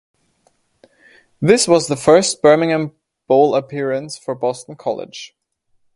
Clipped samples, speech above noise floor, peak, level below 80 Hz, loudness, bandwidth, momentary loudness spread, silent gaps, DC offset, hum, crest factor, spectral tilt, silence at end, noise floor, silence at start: under 0.1%; 47 dB; 0 dBFS; -58 dBFS; -16 LUFS; 11.5 kHz; 15 LU; none; under 0.1%; none; 18 dB; -4.5 dB/octave; 0.7 s; -62 dBFS; 1.4 s